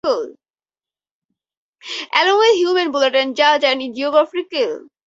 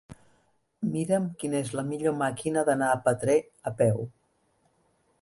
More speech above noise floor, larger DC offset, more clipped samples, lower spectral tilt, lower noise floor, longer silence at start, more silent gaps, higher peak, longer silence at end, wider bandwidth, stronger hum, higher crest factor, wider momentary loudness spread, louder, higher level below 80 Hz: first, over 73 dB vs 43 dB; neither; neither; second, -1.5 dB/octave vs -6 dB/octave; first, under -90 dBFS vs -69 dBFS; about the same, 0.05 s vs 0.1 s; first, 1.11-1.29 s, 1.57-1.73 s vs none; first, 0 dBFS vs -10 dBFS; second, 0.25 s vs 1.15 s; second, 7.8 kHz vs 11.5 kHz; neither; about the same, 18 dB vs 18 dB; about the same, 10 LU vs 8 LU; first, -16 LUFS vs -28 LUFS; about the same, -68 dBFS vs -64 dBFS